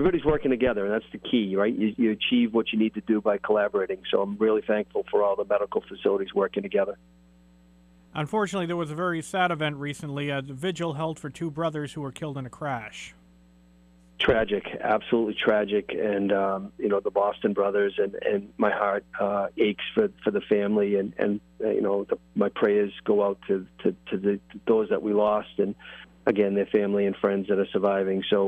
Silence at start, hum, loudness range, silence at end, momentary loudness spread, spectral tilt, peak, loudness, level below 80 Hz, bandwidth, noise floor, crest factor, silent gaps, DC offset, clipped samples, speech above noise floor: 0 s; none; 5 LU; 0 s; 8 LU; -6.5 dB/octave; -10 dBFS; -26 LUFS; -54 dBFS; 11.5 kHz; -56 dBFS; 16 dB; none; under 0.1%; under 0.1%; 31 dB